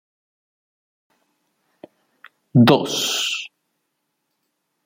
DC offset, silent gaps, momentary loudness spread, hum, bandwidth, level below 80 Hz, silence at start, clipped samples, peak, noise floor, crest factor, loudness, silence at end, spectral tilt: under 0.1%; none; 13 LU; none; 16.5 kHz; -66 dBFS; 2.55 s; under 0.1%; -2 dBFS; -75 dBFS; 22 dB; -18 LUFS; 1.4 s; -4.5 dB/octave